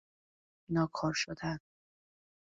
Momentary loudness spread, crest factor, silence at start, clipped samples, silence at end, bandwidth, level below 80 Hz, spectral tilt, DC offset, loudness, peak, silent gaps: 7 LU; 18 dB; 0.7 s; under 0.1%; 0.95 s; 8 kHz; -64 dBFS; -5 dB/octave; under 0.1%; -35 LUFS; -20 dBFS; none